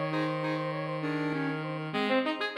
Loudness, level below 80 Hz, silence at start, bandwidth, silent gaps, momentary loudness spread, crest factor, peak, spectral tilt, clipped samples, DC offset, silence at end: -31 LUFS; -78 dBFS; 0 s; 11.5 kHz; none; 5 LU; 16 dB; -16 dBFS; -7 dB/octave; under 0.1%; under 0.1%; 0 s